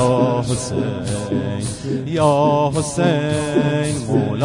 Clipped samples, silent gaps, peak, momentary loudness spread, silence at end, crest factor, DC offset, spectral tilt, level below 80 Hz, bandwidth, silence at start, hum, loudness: under 0.1%; none; -4 dBFS; 8 LU; 0 s; 14 dB; under 0.1%; -6 dB/octave; -44 dBFS; 11 kHz; 0 s; none; -19 LUFS